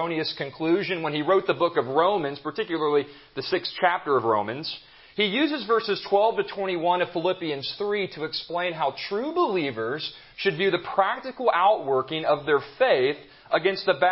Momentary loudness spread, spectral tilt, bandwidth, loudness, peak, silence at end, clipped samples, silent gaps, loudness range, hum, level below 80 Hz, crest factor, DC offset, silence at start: 8 LU; -9 dB/octave; 5.8 kHz; -25 LUFS; -6 dBFS; 0 s; under 0.1%; none; 3 LU; none; -68 dBFS; 18 dB; under 0.1%; 0 s